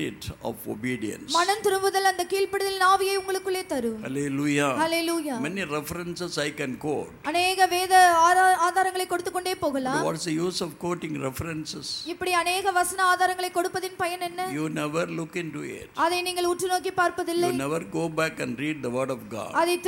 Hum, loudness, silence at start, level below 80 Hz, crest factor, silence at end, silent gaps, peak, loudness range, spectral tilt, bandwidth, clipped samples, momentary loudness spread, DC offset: none; -25 LUFS; 0 s; -58 dBFS; 18 dB; 0 s; none; -6 dBFS; 6 LU; -3.5 dB/octave; 17.5 kHz; under 0.1%; 11 LU; under 0.1%